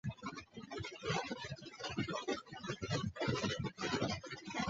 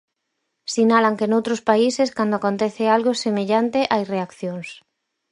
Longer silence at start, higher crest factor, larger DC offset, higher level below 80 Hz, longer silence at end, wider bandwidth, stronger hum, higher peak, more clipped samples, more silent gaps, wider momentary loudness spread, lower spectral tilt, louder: second, 0.05 s vs 0.7 s; about the same, 20 dB vs 18 dB; neither; about the same, -62 dBFS vs -66 dBFS; second, 0 s vs 0.55 s; second, 8 kHz vs 11 kHz; neither; second, -22 dBFS vs -2 dBFS; neither; neither; about the same, 10 LU vs 12 LU; about the same, -4 dB/octave vs -5 dB/octave; second, -41 LUFS vs -20 LUFS